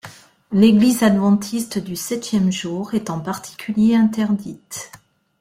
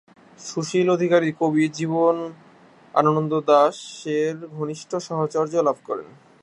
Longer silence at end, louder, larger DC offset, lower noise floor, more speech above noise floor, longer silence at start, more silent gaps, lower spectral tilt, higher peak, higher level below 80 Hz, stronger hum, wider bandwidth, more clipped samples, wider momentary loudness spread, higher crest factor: first, 0.45 s vs 0.3 s; first, -18 LUFS vs -22 LUFS; neither; second, -42 dBFS vs -51 dBFS; second, 24 dB vs 30 dB; second, 0.05 s vs 0.4 s; neither; about the same, -5.5 dB/octave vs -6 dB/octave; about the same, -2 dBFS vs -4 dBFS; first, -56 dBFS vs -72 dBFS; neither; first, 16 kHz vs 11 kHz; neither; first, 16 LU vs 13 LU; about the same, 16 dB vs 20 dB